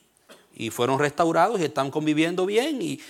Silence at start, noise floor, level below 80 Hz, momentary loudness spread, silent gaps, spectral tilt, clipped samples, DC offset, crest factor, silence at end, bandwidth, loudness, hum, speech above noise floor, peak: 0.3 s; -54 dBFS; -70 dBFS; 6 LU; none; -5 dB/octave; under 0.1%; under 0.1%; 18 dB; 0 s; 16.5 kHz; -23 LUFS; none; 31 dB; -6 dBFS